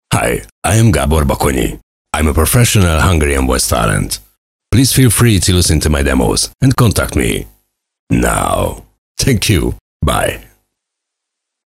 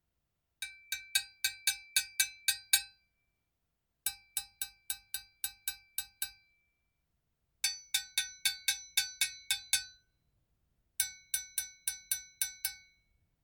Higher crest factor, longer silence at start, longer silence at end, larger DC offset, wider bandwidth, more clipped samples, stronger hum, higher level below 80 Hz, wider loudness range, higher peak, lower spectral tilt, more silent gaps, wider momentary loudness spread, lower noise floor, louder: second, 14 dB vs 30 dB; second, 0.1 s vs 0.6 s; first, 1.25 s vs 0.65 s; neither; second, 16.5 kHz vs 19.5 kHz; neither; neither; first, -24 dBFS vs -72 dBFS; second, 4 LU vs 7 LU; first, 0 dBFS vs -10 dBFS; first, -4.5 dB/octave vs 4.5 dB/octave; first, 0.52-0.62 s, 1.83-2.05 s, 4.38-4.59 s, 7.99-8.07 s, 8.98-9.15 s, 9.81-10.00 s vs none; about the same, 10 LU vs 11 LU; second, -77 dBFS vs -84 dBFS; first, -13 LUFS vs -34 LUFS